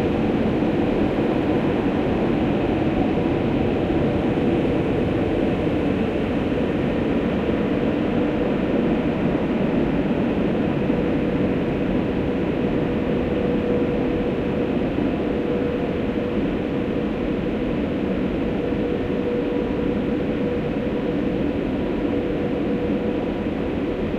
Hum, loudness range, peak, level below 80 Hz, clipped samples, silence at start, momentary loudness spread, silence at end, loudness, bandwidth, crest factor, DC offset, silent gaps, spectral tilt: none; 2 LU; -6 dBFS; -38 dBFS; under 0.1%; 0 s; 3 LU; 0 s; -22 LUFS; 8.2 kHz; 14 dB; under 0.1%; none; -8.5 dB/octave